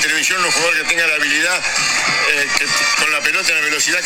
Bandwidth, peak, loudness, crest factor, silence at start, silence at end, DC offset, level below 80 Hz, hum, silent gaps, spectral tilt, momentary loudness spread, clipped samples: 18 kHz; 0 dBFS; -14 LUFS; 16 dB; 0 s; 0 s; under 0.1%; -50 dBFS; none; none; 0 dB/octave; 1 LU; under 0.1%